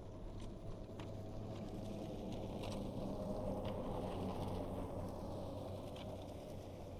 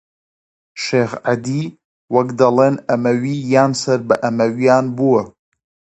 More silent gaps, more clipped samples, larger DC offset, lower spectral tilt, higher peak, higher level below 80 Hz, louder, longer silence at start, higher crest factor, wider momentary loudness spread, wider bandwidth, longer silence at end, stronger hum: second, none vs 1.84-2.08 s; neither; neither; about the same, -7 dB/octave vs -6 dB/octave; second, -32 dBFS vs 0 dBFS; first, -54 dBFS vs -60 dBFS; second, -47 LUFS vs -16 LUFS; second, 0 s vs 0.75 s; about the same, 14 dB vs 16 dB; about the same, 7 LU vs 9 LU; first, 15.5 kHz vs 8.8 kHz; second, 0 s vs 0.7 s; neither